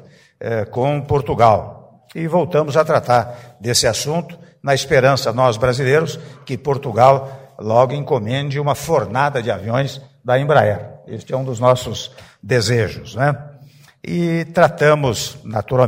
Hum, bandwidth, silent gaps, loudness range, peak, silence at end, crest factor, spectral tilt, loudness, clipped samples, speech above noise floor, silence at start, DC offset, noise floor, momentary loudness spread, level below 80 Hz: none; 16 kHz; none; 3 LU; 0 dBFS; 0 s; 18 dB; -5 dB/octave; -17 LUFS; under 0.1%; 28 dB; 0.4 s; under 0.1%; -45 dBFS; 15 LU; -48 dBFS